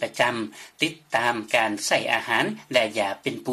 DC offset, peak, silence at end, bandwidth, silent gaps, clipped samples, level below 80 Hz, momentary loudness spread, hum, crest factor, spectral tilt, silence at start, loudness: under 0.1%; -6 dBFS; 0 s; 15 kHz; none; under 0.1%; -68 dBFS; 5 LU; none; 20 dB; -3 dB/octave; 0 s; -24 LUFS